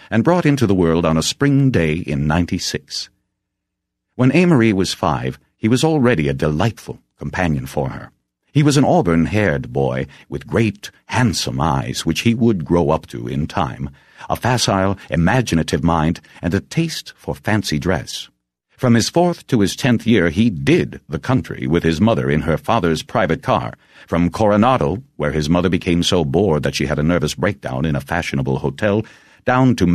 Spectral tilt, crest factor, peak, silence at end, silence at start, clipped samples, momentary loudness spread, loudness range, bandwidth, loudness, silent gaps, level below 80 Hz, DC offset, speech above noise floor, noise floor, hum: -6 dB/octave; 16 dB; -2 dBFS; 0 s; 0.1 s; under 0.1%; 11 LU; 2 LU; 14 kHz; -18 LUFS; none; -38 dBFS; under 0.1%; 61 dB; -78 dBFS; none